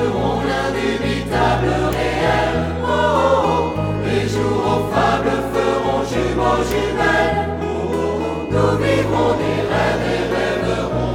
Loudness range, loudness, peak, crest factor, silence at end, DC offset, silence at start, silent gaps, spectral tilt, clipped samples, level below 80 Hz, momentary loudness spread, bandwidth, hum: 1 LU; -18 LUFS; -4 dBFS; 14 dB; 0 s; under 0.1%; 0 s; none; -6 dB/octave; under 0.1%; -32 dBFS; 5 LU; 18 kHz; none